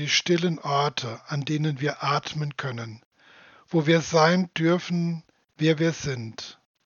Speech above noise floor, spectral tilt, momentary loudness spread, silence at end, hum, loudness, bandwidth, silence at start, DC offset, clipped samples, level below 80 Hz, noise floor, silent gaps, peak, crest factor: 29 dB; -5 dB/octave; 13 LU; 0.35 s; none; -25 LUFS; 7.2 kHz; 0 s; under 0.1%; under 0.1%; -64 dBFS; -53 dBFS; 3.05-3.11 s; -4 dBFS; 20 dB